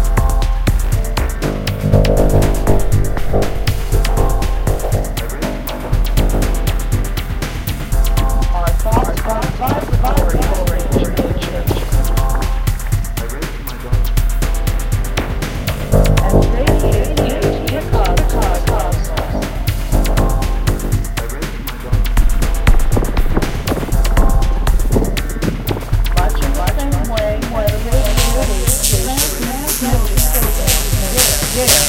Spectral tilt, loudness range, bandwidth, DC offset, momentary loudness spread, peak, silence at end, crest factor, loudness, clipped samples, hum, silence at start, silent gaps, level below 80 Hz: -4.5 dB/octave; 4 LU; 17.5 kHz; 0.6%; 7 LU; 0 dBFS; 0 s; 14 dB; -17 LUFS; under 0.1%; none; 0 s; none; -16 dBFS